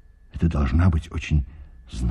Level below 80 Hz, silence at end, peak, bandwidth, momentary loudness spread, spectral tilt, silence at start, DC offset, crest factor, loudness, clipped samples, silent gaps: -28 dBFS; 0 s; -8 dBFS; 9.6 kHz; 18 LU; -7.5 dB/octave; 0.35 s; under 0.1%; 16 dB; -23 LUFS; under 0.1%; none